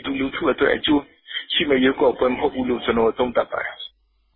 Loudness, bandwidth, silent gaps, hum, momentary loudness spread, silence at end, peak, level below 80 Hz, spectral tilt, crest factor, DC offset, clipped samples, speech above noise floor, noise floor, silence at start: -21 LUFS; 4.3 kHz; none; none; 12 LU; 0.5 s; -6 dBFS; -48 dBFS; -9.5 dB/octave; 16 dB; under 0.1%; under 0.1%; 28 dB; -47 dBFS; 0 s